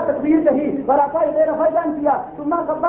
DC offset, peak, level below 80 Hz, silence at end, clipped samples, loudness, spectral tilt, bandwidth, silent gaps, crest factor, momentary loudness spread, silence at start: under 0.1%; -4 dBFS; -52 dBFS; 0 s; under 0.1%; -18 LUFS; -11.5 dB/octave; 3.3 kHz; none; 14 dB; 6 LU; 0 s